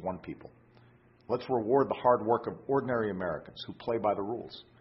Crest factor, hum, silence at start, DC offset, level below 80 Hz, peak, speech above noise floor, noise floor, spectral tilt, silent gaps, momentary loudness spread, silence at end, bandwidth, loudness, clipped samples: 20 dB; none; 0 s; under 0.1%; -62 dBFS; -12 dBFS; 29 dB; -60 dBFS; -10 dB/octave; none; 16 LU; 0.2 s; 5.8 kHz; -31 LUFS; under 0.1%